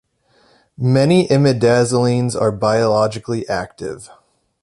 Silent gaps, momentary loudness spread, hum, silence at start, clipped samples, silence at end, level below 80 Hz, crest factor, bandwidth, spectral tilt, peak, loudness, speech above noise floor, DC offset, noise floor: none; 13 LU; none; 0.8 s; under 0.1%; 0.55 s; -50 dBFS; 16 dB; 11.5 kHz; -6.5 dB/octave; -2 dBFS; -16 LUFS; 41 dB; under 0.1%; -56 dBFS